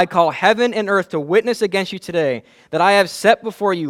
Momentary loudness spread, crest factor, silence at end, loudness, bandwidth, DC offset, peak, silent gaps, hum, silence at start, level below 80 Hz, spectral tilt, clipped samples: 8 LU; 16 dB; 0 s; -17 LUFS; 15.5 kHz; under 0.1%; 0 dBFS; none; none; 0 s; -62 dBFS; -4.5 dB/octave; under 0.1%